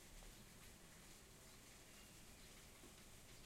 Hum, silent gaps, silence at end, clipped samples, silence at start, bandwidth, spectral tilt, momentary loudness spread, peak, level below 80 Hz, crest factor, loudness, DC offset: none; none; 0 s; under 0.1%; 0 s; 16 kHz; -2.5 dB/octave; 1 LU; -48 dBFS; -68 dBFS; 14 dB; -62 LUFS; under 0.1%